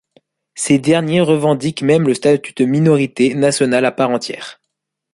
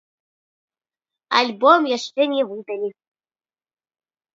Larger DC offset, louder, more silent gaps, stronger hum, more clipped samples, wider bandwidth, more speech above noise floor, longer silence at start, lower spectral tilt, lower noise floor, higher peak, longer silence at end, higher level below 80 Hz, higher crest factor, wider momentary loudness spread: neither; first, -15 LUFS vs -19 LUFS; neither; neither; neither; first, 11.5 kHz vs 7.8 kHz; second, 62 dB vs over 71 dB; second, 0.55 s vs 1.3 s; first, -5.5 dB/octave vs -3 dB/octave; second, -76 dBFS vs under -90 dBFS; about the same, 0 dBFS vs 0 dBFS; second, 0.6 s vs 1.45 s; first, -56 dBFS vs -80 dBFS; second, 14 dB vs 22 dB; second, 10 LU vs 13 LU